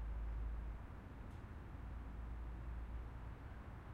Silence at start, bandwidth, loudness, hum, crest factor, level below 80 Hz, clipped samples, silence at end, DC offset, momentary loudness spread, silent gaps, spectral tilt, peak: 0 s; 4.7 kHz; -51 LUFS; none; 12 dB; -48 dBFS; under 0.1%; 0 s; under 0.1%; 6 LU; none; -8 dB/octave; -36 dBFS